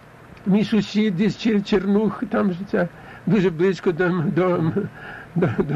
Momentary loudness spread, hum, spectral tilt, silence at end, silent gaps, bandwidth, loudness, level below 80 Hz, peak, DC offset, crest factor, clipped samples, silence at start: 9 LU; none; -7.5 dB/octave; 0 s; none; 7.8 kHz; -21 LUFS; -50 dBFS; -8 dBFS; under 0.1%; 12 dB; under 0.1%; 0.3 s